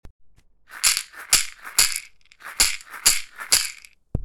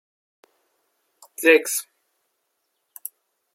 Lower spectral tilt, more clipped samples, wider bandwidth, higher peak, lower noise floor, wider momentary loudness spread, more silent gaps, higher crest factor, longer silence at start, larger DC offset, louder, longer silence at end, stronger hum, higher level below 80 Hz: about the same, 1 dB/octave vs 0 dB/octave; neither; first, over 20 kHz vs 16.5 kHz; about the same, -2 dBFS vs -2 dBFS; second, -51 dBFS vs -75 dBFS; second, 11 LU vs 21 LU; first, 0.10-0.19 s vs none; about the same, 24 dB vs 24 dB; second, 0.05 s vs 1.4 s; neither; about the same, -20 LUFS vs -19 LUFS; second, 0 s vs 1.7 s; neither; first, -42 dBFS vs -90 dBFS